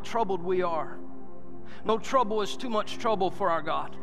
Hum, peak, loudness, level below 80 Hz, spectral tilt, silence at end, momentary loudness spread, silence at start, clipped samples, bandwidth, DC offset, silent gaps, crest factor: none; -10 dBFS; -29 LUFS; -60 dBFS; -5 dB/octave; 0 s; 20 LU; 0 s; under 0.1%; 13.5 kHz; 3%; none; 18 dB